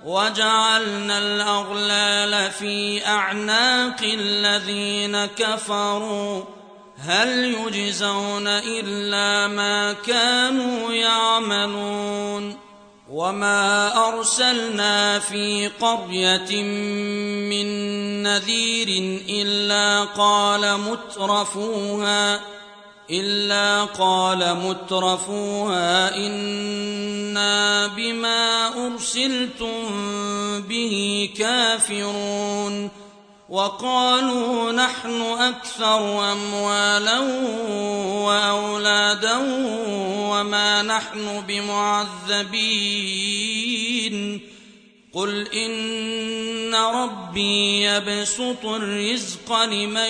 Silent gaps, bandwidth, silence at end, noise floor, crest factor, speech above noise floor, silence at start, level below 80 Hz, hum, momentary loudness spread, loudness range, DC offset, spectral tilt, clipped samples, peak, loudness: none; 10.5 kHz; 0 s; -50 dBFS; 16 dB; 28 dB; 0 s; -64 dBFS; none; 8 LU; 3 LU; under 0.1%; -2 dB/octave; under 0.1%; -6 dBFS; -20 LUFS